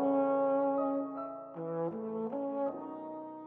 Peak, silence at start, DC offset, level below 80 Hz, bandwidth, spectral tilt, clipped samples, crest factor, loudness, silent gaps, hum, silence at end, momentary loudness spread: -20 dBFS; 0 s; under 0.1%; -82 dBFS; 3.5 kHz; -11 dB/octave; under 0.1%; 14 dB; -35 LUFS; none; none; 0 s; 13 LU